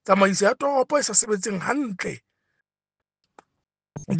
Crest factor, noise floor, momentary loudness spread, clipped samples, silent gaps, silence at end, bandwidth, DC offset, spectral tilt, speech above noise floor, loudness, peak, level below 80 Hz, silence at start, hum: 22 dB; -88 dBFS; 19 LU; under 0.1%; none; 0 s; 10 kHz; under 0.1%; -3.5 dB/octave; 66 dB; -22 LUFS; -4 dBFS; -64 dBFS; 0.05 s; none